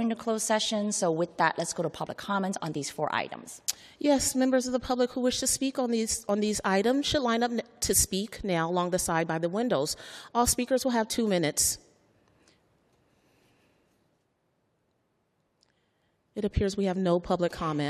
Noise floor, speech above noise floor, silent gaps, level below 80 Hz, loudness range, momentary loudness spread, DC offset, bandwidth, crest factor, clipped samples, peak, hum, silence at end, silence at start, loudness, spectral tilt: -74 dBFS; 46 dB; none; -52 dBFS; 6 LU; 8 LU; under 0.1%; 14 kHz; 24 dB; under 0.1%; -6 dBFS; none; 0 s; 0 s; -28 LUFS; -3.5 dB/octave